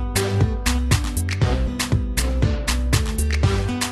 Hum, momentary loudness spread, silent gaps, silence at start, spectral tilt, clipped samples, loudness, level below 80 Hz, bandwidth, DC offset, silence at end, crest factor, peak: none; 3 LU; none; 0 s; -4.5 dB/octave; under 0.1%; -21 LUFS; -24 dBFS; 13 kHz; 0.3%; 0 s; 16 dB; -4 dBFS